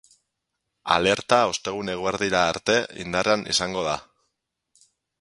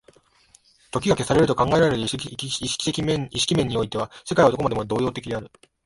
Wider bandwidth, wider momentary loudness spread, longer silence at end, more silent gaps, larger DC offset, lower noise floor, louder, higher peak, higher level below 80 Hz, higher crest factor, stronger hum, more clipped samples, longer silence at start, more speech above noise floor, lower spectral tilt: about the same, 11.5 kHz vs 11.5 kHz; about the same, 8 LU vs 10 LU; first, 1.2 s vs 0.4 s; neither; neither; first, -80 dBFS vs -58 dBFS; about the same, -23 LUFS vs -23 LUFS; about the same, -2 dBFS vs -4 dBFS; second, -54 dBFS vs -48 dBFS; about the same, 22 dB vs 20 dB; neither; neither; about the same, 0.85 s vs 0.95 s; first, 57 dB vs 35 dB; second, -3 dB/octave vs -5 dB/octave